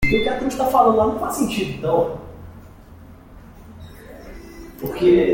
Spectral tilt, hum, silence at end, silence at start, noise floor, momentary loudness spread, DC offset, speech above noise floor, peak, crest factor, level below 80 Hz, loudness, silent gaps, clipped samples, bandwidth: -5.5 dB/octave; none; 0 s; 0 s; -43 dBFS; 25 LU; under 0.1%; 25 dB; -2 dBFS; 18 dB; -40 dBFS; -19 LUFS; none; under 0.1%; 17 kHz